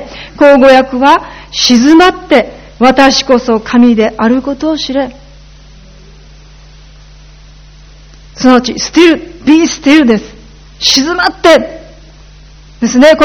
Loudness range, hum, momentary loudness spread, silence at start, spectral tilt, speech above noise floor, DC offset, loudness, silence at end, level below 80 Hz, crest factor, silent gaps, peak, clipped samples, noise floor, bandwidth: 10 LU; none; 9 LU; 0 s; -3.5 dB/octave; 28 dB; under 0.1%; -8 LUFS; 0 s; -36 dBFS; 10 dB; none; 0 dBFS; 3%; -35 dBFS; 14.5 kHz